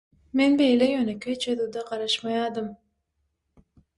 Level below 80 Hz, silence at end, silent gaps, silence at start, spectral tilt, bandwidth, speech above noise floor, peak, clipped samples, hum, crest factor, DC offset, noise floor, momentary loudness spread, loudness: -64 dBFS; 1.25 s; none; 0.35 s; -4 dB/octave; 11.5 kHz; 52 dB; -10 dBFS; under 0.1%; none; 16 dB; under 0.1%; -76 dBFS; 11 LU; -25 LUFS